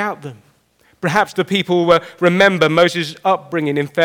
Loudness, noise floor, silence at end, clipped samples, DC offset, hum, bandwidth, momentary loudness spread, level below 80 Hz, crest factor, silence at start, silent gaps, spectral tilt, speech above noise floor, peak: -16 LUFS; -56 dBFS; 0 s; under 0.1%; under 0.1%; none; 17.5 kHz; 10 LU; -58 dBFS; 16 dB; 0 s; none; -5.5 dB/octave; 41 dB; -2 dBFS